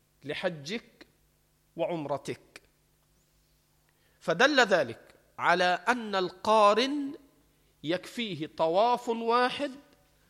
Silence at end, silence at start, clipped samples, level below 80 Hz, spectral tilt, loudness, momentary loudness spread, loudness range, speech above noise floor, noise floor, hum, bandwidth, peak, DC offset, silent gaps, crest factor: 0.5 s; 0.25 s; under 0.1%; -72 dBFS; -4 dB/octave; -28 LUFS; 16 LU; 13 LU; 41 dB; -69 dBFS; none; 15.5 kHz; -8 dBFS; under 0.1%; none; 22 dB